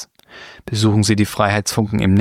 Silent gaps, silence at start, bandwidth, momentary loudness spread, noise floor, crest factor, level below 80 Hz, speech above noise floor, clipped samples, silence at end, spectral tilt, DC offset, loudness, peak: none; 0 s; 15.5 kHz; 20 LU; -41 dBFS; 16 dB; -42 dBFS; 25 dB; under 0.1%; 0 s; -5.5 dB/octave; under 0.1%; -17 LUFS; -2 dBFS